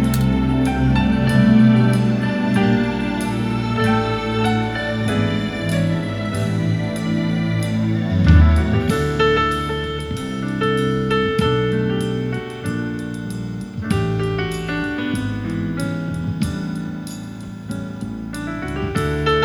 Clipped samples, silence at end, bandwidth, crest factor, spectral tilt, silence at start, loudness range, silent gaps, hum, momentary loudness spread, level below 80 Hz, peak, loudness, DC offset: under 0.1%; 0 s; 19.5 kHz; 18 dB; -7 dB/octave; 0 s; 8 LU; none; none; 12 LU; -30 dBFS; 0 dBFS; -20 LUFS; under 0.1%